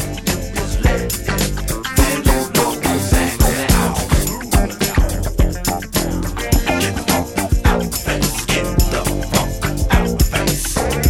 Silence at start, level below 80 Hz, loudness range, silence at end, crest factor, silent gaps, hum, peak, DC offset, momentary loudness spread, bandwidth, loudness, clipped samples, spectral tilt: 0 s; -20 dBFS; 2 LU; 0 s; 16 dB; none; none; 0 dBFS; 0.3%; 5 LU; 17 kHz; -18 LUFS; under 0.1%; -4.5 dB/octave